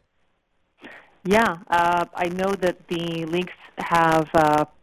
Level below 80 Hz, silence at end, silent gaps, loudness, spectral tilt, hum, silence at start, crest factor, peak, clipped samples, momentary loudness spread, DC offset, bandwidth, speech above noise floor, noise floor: -52 dBFS; 0.2 s; none; -22 LUFS; -5.5 dB/octave; none; 0.85 s; 18 dB; -6 dBFS; under 0.1%; 10 LU; under 0.1%; 16 kHz; 48 dB; -69 dBFS